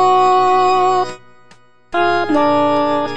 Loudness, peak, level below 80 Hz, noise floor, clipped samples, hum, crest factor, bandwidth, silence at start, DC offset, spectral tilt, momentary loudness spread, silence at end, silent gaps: -14 LUFS; -4 dBFS; -56 dBFS; -49 dBFS; under 0.1%; none; 12 dB; 9.8 kHz; 0 s; 3%; -5 dB/octave; 7 LU; 0 s; none